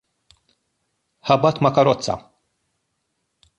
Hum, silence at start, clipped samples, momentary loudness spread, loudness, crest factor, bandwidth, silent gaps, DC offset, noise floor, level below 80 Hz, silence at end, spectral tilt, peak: none; 1.25 s; under 0.1%; 13 LU; -19 LUFS; 20 dB; 10.5 kHz; none; under 0.1%; -74 dBFS; -56 dBFS; 1.4 s; -6 dB/octave; -2 dBFS